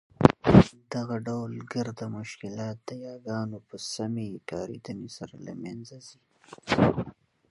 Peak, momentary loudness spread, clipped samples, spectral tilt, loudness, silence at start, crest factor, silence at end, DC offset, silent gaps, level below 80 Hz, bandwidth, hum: 0 dBFS; 20 LU; under 0.1%; -7 dB/octave; -27 LUFS; 0.2 s; 28 dB; 0.4 s; under 0.1%; none; -46 dBFS; 11.5 kHz; none